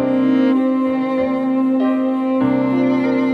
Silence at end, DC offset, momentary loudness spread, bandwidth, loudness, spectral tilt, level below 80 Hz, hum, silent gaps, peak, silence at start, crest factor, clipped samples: 0 s; under 0.1%; 3 LU; 5 kHz; -17 LUFS; -8.5 dB/octave; -56 dBFS; none; none; -6 dBFS; 0 s; 10 dB; under 0.1%